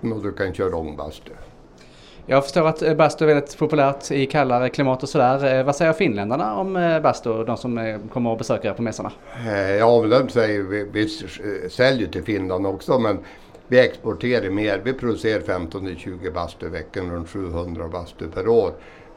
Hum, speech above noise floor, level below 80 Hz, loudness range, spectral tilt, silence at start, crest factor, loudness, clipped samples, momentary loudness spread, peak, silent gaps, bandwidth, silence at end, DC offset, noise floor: none; 25 dB; -46 dBFS; 6 LU; -6 dB/octave; 0 s; 20 dB; -21 LUFS; under 0.1%; 12 LU; -2 dBFS; none; 12 kHz; 0 s; under 0.1%; -46 dBFS